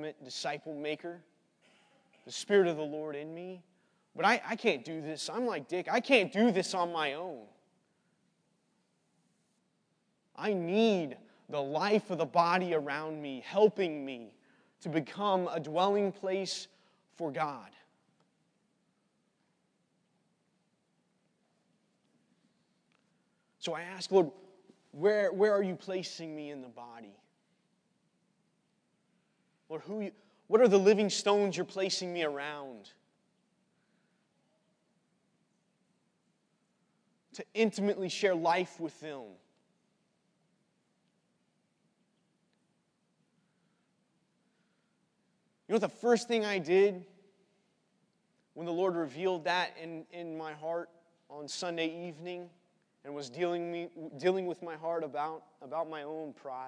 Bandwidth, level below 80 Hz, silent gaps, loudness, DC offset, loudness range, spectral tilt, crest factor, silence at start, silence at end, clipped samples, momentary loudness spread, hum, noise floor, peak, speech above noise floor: 10.5 kHz; under -90 dBFS; none; -32 LUFS; under 0.1%; 13 LU; -4.5 dB/octave; 26 dB; 0 s; 0 s; under 0.1%; 17 LU; none; -77 dBFS; -10 dBFS; 44 dB